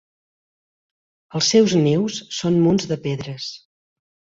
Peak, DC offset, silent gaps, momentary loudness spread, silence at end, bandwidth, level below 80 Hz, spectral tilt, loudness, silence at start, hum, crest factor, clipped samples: -4 dBFS; under 0.1%; none; 15 LU; 0.75 s; 7.8 kHz; -58 dBFS; -5 dB/octave; -19 LUFS; 1.35 s; none; 18 dB; under 0.1%